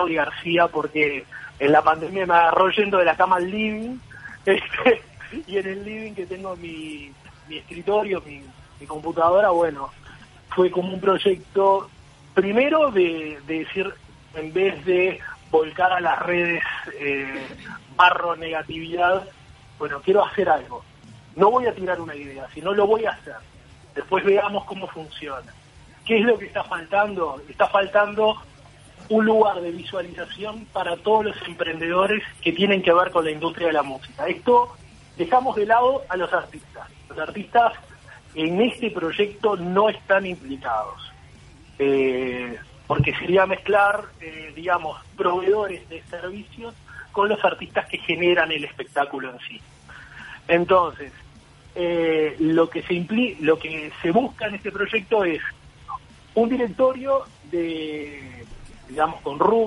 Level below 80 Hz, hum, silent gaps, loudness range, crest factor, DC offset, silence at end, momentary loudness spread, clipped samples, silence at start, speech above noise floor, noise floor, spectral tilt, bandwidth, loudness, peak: -52 dBFS; none; none; 4 LU; 20 dB; under 0.1%; 0 s; 18 LU; under 0.1%; 0 s; 26 dB; -48 dBFS; -6 dB/octave; 11.5 kHz; -22 LUFS; -2 dBFS